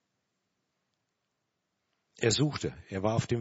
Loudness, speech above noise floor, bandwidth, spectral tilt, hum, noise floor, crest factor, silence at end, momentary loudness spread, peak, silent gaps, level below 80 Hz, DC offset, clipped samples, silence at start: -30 LUFS; 52 dB; 8 kHz; -5 dB/octave; none; -82 dBFS; 22 dB; 0 s; 9 LU; -14 dBFS; none; -60 dBFS; under 0.1%; under 0.1%; 2.2 s